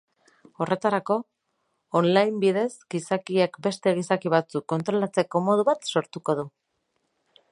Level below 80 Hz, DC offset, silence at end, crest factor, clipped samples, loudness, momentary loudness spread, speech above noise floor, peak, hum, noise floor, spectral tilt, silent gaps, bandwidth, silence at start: -74 dBFS; under 0.1%; 1.05 s; 22 dB; under 0.1%; -25 LUFS; 7 LU; 51 dB; -4 dBFS; none; -75 dBFS; -6 dB/octave; none; 11.5 kHz; 0.6 s